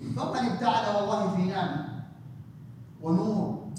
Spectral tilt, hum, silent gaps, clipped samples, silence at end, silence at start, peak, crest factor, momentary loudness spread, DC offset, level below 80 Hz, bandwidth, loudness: -7 dB/octave; none; none; under 0.1%; 0 s; 0 s; -12 dBFS; 18 dB; 20 LU; under 0.1%; -66 dBFS; 10 kHz; -28 LUFS